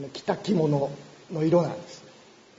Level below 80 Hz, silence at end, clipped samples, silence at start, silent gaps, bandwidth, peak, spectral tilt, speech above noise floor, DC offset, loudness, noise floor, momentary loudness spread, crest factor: -66 dBFS; 0.5 s; under 0.1%; 0 s; none; 7.8 kHz; -10 dBFS; -7.5 dB/octave; 27 dB; under 0.1%; -26 LUFS; -53 dBFS; 21 LU; 18 dB